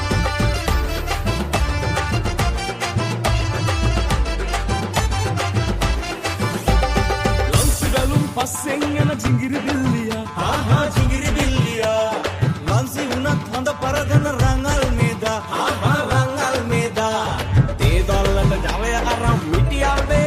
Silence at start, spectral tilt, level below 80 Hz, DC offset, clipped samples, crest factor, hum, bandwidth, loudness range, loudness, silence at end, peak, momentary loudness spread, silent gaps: 0 s; -5 dB/octave; -24 dBFS; under 0.1%; under 0.1%; 16 dB; none; 15.5 kHz; 2 LU; -20 LUFS; 0 s; -2 dBFS; 4 LU; none